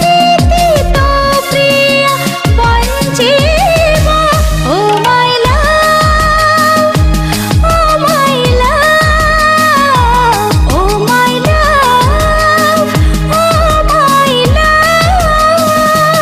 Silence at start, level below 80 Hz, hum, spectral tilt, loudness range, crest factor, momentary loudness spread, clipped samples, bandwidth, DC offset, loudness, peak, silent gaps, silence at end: 0 s; -16 dBFS; none; -4.5 dB/octave; 1 LU; 8 dB; 3 LU; under 0.1%; 15.5 kHz; under 0.1%; -8 LUFS; 0 dBFS; none; 0 s